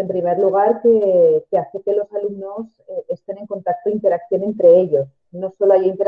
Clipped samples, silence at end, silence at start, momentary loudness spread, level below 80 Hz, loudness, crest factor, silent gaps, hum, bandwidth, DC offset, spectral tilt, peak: under 0.1%; 0 s; 0 s; 16 LU; -64 dBFS; -17 LUFS; 14 dB; none; none; 3.4 kHz; under 0.1%; -10 dB/octave; -2 dBFS